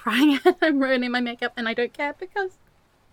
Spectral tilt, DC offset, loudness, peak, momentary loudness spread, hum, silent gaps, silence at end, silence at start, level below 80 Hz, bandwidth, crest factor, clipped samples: -4 dB/octave; under 0.1%; -23 LUFS; -4 dBFS; 11 LU; none; none; 0.65 s; 0 s; -64 dBFS; 17.5 kHz; 18 dB; under 0.1%